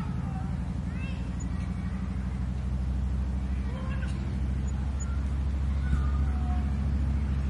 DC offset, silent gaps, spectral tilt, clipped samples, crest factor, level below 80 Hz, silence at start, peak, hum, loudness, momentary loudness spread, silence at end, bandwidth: under 0.1%; none; -7.5 dB/octave; under 0.1%; 14 dB; -30 dBFS; 0 s; -16 dBFS; none; -31 LUFS; 4 LU; 0 s; 8.2 kHz